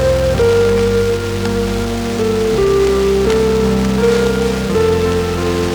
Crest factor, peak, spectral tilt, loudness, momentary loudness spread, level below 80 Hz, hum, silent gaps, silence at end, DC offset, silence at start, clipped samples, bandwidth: 12 dB; -2 dBFS; -6 dB/octave; -14 LUFS; 5 LU; -26 dBFS; none; none; 0 s; under 0.1%; 0 s; under 0.1%; over 20 kHz